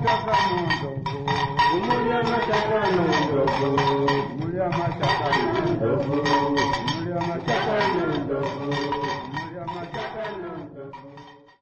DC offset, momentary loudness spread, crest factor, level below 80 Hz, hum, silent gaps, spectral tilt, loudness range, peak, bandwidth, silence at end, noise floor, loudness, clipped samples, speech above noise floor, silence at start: under 0.1%; 11 LU; 14 dB; -50 dBFS; none; none; -6 dB/octave; 5 LU; -10 dBFS; 9 kHz; 0.25 s; -46 dBFS; -24 LUFS; under 0.1%; 24 dB; 0 s